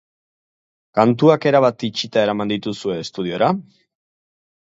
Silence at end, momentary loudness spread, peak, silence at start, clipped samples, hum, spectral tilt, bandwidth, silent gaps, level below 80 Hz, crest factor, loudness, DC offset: 1.05 s; 11 LU; 0 dBFS; 0.95 s; under 0.1%; none; -6.5 dB/octave; 8 kHz; none; -62 dBFS; 18 dB; -18 LUFS; under 0.1%